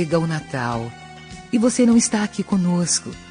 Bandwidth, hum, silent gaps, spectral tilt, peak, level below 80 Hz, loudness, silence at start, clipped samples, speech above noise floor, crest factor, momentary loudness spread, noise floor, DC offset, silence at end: 10 kHz; none; none; -4.5 dB/octave; -6 dBFS; -50 dBFS; -20 LUFS; 0 s; under 0.1%; 19 dB; 14 dB; 18 LU; -39 dBFS; under 0.1%; 0 s